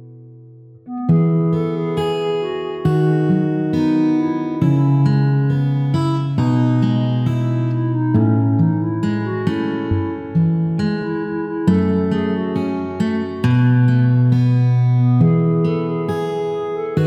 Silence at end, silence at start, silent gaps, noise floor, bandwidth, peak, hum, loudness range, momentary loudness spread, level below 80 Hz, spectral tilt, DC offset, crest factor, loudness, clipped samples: 0 s; 0 s; none; -41 dBFS; 8 kHz; -2 dBFS; none; 4 LU; 7 LU; -50 dBFS; -9.5 dB/octave; under 0.1%; 14 dB; -17 LUFS; under 0.1%